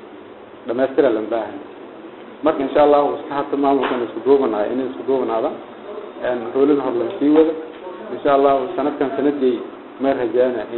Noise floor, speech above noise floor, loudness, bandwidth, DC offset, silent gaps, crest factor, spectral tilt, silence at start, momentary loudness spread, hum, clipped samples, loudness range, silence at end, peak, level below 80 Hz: -39 dBFS; 21 dB; -18 LUFS; 4.2 kHz; under 0.1%; none; 18 dB; -10.5 dB/octave; 0 s; 19 LU; none; under 0.1%; 2 LU; 0 s; -2 dBFS; -58 dBFS